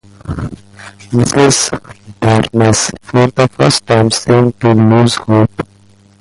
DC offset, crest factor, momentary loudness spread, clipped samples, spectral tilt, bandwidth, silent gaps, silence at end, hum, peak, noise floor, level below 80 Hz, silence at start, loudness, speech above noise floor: under 0.1%; 12 dB; 15 LU; under 0.1%; -5 dB/octave; 11.5 kHz; none; 0.55 s; none; 0 dBFS; -45 dBFS; -38 dBFS; 0.25 s; -11 LUFS; 34 dB